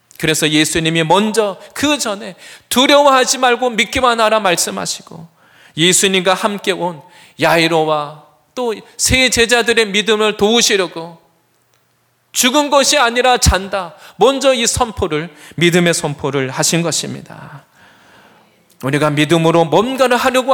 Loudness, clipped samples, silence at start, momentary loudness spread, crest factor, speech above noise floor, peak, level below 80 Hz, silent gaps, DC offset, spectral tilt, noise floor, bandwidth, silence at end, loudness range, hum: -13 LUFS; under 0.1%; 0.2 s; 12 LU; 14 dB; 45 dB; 0 dBFS; -36 dBFS; none; under 0.1%; -3 dB/octave; -59 dBFS; 19.5 kHz; 0 s; 4 LU; none